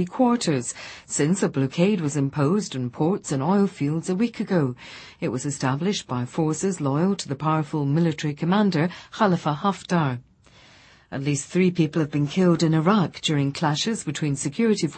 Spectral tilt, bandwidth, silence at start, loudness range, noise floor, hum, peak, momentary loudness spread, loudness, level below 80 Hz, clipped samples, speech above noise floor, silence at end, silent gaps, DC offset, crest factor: -5.5 dB/octave; 8.8 kHz; 0 s; 3 LU; -53 dBFS; none; -6 dBFS; 7 LU; -23 LUFS; -60 dBFS; under 0.1%; 30 dB; 0 s; none; under 0.1%; 18 dB